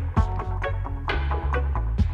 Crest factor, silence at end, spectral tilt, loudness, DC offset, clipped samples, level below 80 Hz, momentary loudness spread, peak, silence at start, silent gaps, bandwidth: 16 dB; 0 s; -8 dB/octave; -27 LUFS; under 0.1%; under 0.1%; -26 dBFS; 3 LU; -8 dBFS; 0 s; none; 6.8 kHz